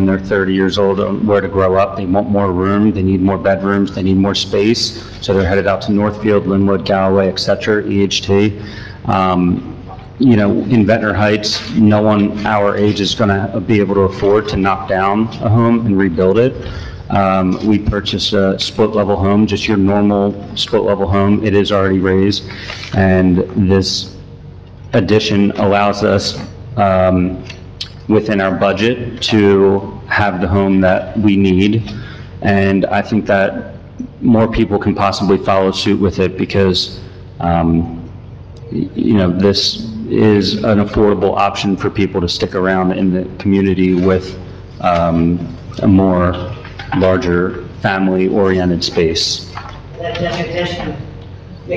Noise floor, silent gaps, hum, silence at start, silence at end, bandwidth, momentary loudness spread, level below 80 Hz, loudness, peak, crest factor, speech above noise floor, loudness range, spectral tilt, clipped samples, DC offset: -33 dBFS; none; none; 0 s; 0 s; 8.4 kHz; 13 LU; -36 dBFS; -14 LUFS; -2 dBFS; 12 dB; 20 dB; 2 LU; -6 dB/octave; under 0.1%; 0.4%